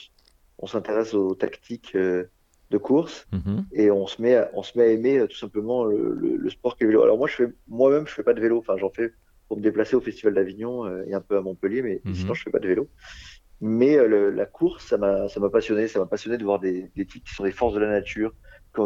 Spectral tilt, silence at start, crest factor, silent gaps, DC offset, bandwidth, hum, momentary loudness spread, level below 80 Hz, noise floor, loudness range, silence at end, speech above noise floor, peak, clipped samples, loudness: -7 dB/octave; 0.6 s; 18 dB; none; under 0.1%; 7.6 kHz; none; 11 LU; -52 dBFS; -60 dBFS; 4 LU; 0 s; 37 dB; -6 dBFS; under 0.1%; -24 LUFS